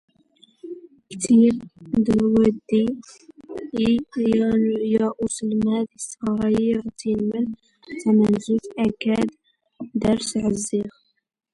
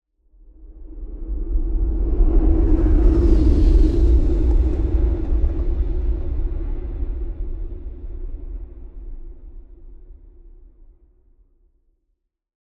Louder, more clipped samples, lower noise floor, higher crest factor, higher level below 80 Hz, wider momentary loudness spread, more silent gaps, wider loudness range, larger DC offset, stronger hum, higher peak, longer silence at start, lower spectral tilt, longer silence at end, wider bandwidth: about the same, -22 LUFS vs -21 LUFS; neither; second, -57 dBFS vs -72 dBFS; about the same, 16 dB vs 16 dB; second, -52 dBFS vs -20 dBFS; second, 17 LU vs 21 LU; neither; second, 2 LU vs 20 LU; neither; neither; about the same, -6 dBFS vs -4 dBFS; about the same, 0.65 s vs 0.6 s; second, -6 dB/octave vs -10.5 dB/octave; second, 0.65 s vs 2.15 s; first, 11.5 kHz vs 4.5 kHz